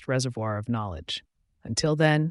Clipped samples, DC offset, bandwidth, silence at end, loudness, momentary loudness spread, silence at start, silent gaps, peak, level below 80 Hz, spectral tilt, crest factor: under 0.1%; under 0.1%; 11.5 kHz; 0 s; -27 LUFS; 12 LU; 0 s; none; -8 dBFS; -52 dBFS; -5 dB/octave; 18 dB